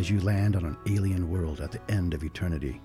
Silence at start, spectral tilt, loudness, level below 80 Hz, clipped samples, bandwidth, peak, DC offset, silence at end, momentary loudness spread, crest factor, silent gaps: 0 s; -7.5 dB/octave; -29 LUFS; -42 dBFS; under 0.1%; 13 kHz; -16 dBFS; under 0.1%; 0 s; 6 LU; 12 dB; none